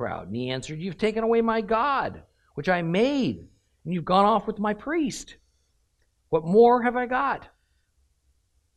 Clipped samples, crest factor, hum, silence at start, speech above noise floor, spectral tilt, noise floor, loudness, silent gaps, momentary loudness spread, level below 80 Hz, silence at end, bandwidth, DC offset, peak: under 0.1%; 20 dB; none; 0 s; 45 dB; -6 dB/octave; -69 dBFS; -24 LUFS; none; 15 LU; -54 dBFS; 1.3 s; 11.5 kHz; under 0.1%; -6 dBFS